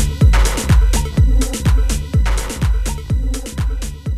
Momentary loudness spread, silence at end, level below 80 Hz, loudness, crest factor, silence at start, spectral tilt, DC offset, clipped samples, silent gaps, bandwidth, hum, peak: 9 LU; 0 s; -16 dBFS; -17 LUFS; 14 dB; 0 s; -5 dB/octave; under 0.1%; under 0.1%; none; 14.5 kHz; none; -2 dBFS